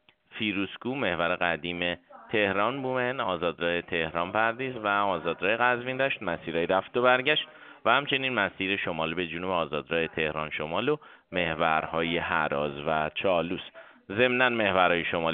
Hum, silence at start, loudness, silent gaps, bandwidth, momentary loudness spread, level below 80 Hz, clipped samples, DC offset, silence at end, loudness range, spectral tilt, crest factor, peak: none; 0.3 s; -27 LUFS; none; 4.7 kHz; 8 LU; -60 dBFS; under 0.1%; under 0.1%; 0 s; 3 LU; -2 dB/octave; 22 dB; -6 dBFS